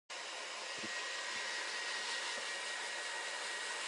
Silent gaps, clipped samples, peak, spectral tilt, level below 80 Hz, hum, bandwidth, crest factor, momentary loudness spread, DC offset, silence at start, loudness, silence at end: none; under 0.1%; -28 dBFS; 1.5 dB/octave; under -90 dBFS; none; 11.5 kHz; 14 dB; 4 LU; under 0.1%; 0.1 s; -40 LUFS; 0 s